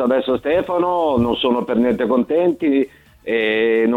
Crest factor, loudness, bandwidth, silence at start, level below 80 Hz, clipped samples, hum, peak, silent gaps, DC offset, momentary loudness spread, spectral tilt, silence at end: 12 dB; -18 LUFS; 5.2 kHz; 0 s; -48 dBFS; under 0.1%; none; -6 dBFS; none; under 0.1%; 4 LU; -7 dB/octave; 0 s